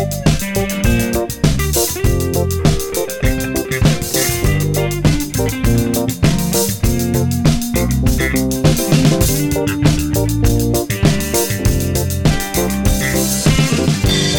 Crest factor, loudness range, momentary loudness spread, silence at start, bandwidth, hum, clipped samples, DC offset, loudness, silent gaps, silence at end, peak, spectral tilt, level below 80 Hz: 14 dB; 2 LU; 4 LU; 0 s; 17.5 kHz; none; under 0.1%; under 0.1%; -15 LUFS; none; 0 s; 0 dBFS; -5 dB/octave; -24 dBFS